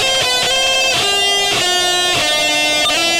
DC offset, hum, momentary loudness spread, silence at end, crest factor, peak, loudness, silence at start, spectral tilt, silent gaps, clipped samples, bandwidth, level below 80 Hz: under 0.1%; none; 1 LU; 0 s; 10 dB; -6 dBFS; -12 LUFS; 0 s; -0.5 dB/octave; none; under 0.1%; over 20 kHz; -44 dBFS